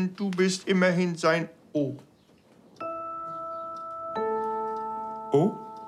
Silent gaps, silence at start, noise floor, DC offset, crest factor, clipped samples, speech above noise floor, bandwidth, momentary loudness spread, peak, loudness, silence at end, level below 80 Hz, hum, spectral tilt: none; 0 s; -58 dBFS; under 0.1%; 20 dB; under 0.1%; 33 dB; 11.5 kHz; 12 LU; -10 dBFS; -28 LUFS; 0 s; -74 dBFS; none; -5.5 dB/octave